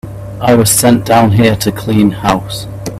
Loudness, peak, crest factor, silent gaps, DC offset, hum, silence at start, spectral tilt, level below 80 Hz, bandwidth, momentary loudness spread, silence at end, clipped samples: -10 LUFS; 0 dBFS; 10 dB; none; under 0.1%; none; 0.05 s; -5 dB/octave; -34 dBFS; 16 kHz; 14 LU; 0 s; under 0.1%